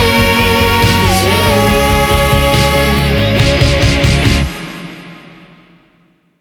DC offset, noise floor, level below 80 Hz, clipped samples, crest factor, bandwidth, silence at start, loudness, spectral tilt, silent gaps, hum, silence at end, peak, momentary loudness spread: under 0.1%; -52 dBFS; -20 dBFS; under 0.1%; 10 dB; 19 kHz; 0 s; -10 LUFS; -4.5 dB/octave; none; none; 1.25 s; 0 dBFS; 11 LU